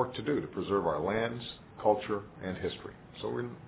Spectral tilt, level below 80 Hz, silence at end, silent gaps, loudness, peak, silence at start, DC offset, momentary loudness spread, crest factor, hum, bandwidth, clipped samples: -4.5 dB/octave; -58 dBFS; 0 s; none; -34 LUFS; -12 dBFS; 0 s; under 0.1%; 11 LU; 20 dB; none; 4 kHz; under 0.1%